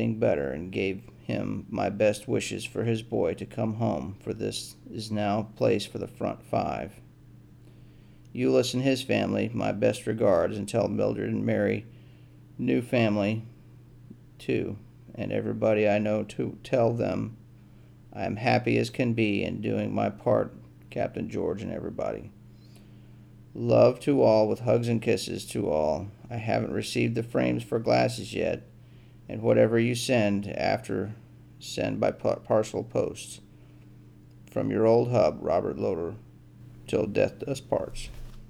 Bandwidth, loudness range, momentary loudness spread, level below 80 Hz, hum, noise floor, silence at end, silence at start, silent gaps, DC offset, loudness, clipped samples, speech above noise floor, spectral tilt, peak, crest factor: 15 kHz; 5 LU; 13 LU; -54 dBFS; none; -52 dBFS; 0 s; 0 s; none; under 0.1%; -27 LUFS; under 0.1%; 25 dB; -6.5 dB/octave; -8 dBFS; 20 dB